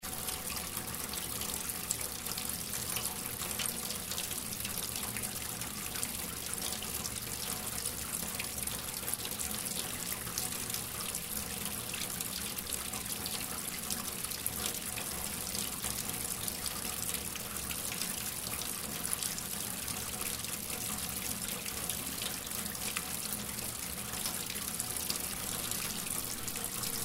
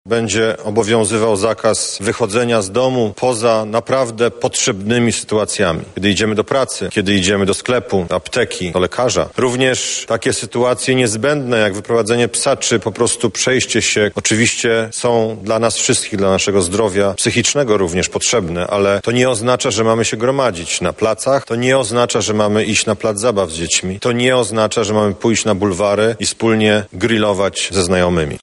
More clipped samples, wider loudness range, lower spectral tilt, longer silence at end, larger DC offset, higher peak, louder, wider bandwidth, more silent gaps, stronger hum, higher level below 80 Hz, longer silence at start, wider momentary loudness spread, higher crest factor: neither; about the same, 1 LU vs 1 LU; second, -1.5 dB/octave vs -3.5 dB/octave; about the same, 0 s vs 0.05 s; neither; second, -12 dBFS vs 0 dBFS; second, -35 LUFS vs -15 LUFS; first, 16.5 kHz vs 11.5 kHz; neither; neither; second, -56 dBFS vs -46 dBFS; about the same, 0 s vs 0.05 s; about the same, 2 LU vs 4 LU; first, 26 dB vs 16 dB